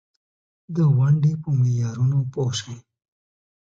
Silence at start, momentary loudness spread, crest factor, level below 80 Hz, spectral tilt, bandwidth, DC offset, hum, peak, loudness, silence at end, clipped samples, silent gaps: 0.7 s; 12 LU; 14 dB; -58 dBFS; -7 dB/octave; 7.8 kHz; under 0.1%; none; -10 dBFS; -21 LUFS; 0.8 s; under 0.1%; none